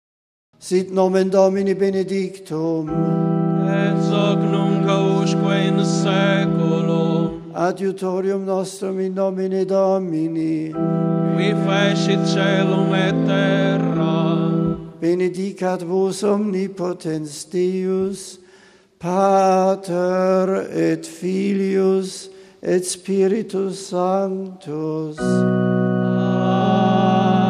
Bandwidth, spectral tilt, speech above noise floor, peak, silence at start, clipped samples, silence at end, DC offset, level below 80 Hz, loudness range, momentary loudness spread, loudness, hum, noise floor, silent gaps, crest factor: 12 kHz; -6.5 dB/octave; 32 dB; -2 dBFS; 0.6 s; under 0.1%; 0 s; under 0.1%; -58 dBFS; 4 LU; 8 LU; -19 LUFS; none; -50 dBFS; none; 16 dB